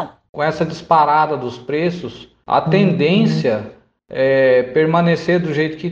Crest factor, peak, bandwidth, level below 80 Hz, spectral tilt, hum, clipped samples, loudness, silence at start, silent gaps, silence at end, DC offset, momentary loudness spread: 14 dB; -2 dBFS; 7.6 kHz; -54 dBFS; -7.5 dB/octave; none; under 0.1%; -16 LUFS; 0 s; 0.29-0.33 s; 0 s; under 0.1%; 11 LU